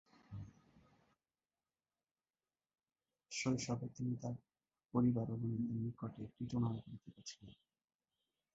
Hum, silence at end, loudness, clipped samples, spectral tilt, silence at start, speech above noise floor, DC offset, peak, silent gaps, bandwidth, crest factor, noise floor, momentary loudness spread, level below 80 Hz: none; 1.05 s; -41 LUFS; under 0.1%; -7 dB/octave; 0.3 s; over 49 dB; under 0.1%; -24 dBFS; 2.11-2.15 s; 7.6 kHz; 20 dB; under -90 dBFS; 17 LU; -70 dBFS